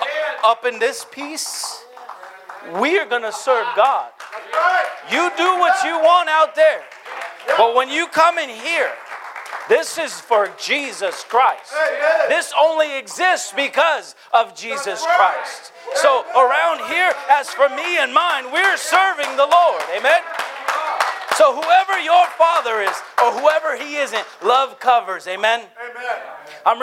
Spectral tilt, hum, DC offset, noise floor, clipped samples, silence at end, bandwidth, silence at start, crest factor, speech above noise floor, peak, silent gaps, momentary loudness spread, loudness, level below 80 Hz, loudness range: -0.5 dB/octave; none; under 0.1%; -37 dBFS; under 0.1%; 0 s; 16 kHz; 0 s; 18 dB; 20 dB; 0 dBFS; none; 13 LU; -17 LUFS; -80 dBFS; 4 LU